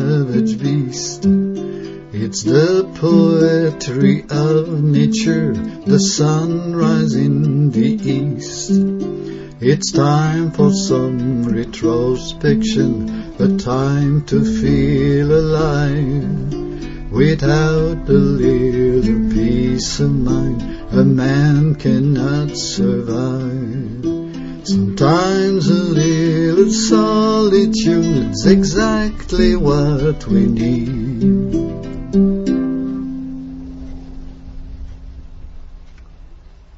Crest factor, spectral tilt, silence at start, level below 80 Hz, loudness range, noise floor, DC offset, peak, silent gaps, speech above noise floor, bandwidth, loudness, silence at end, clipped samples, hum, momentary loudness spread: 16 dB; -6.5 dB/octave; 0 s; -30 dBFS; 4 LU; -39 dBFS; under 0.1%; 0 dBFS; none; 24 dB; 8 kHz; -15 LUFS; 0.4 s; under 0.1%; none; 11 LU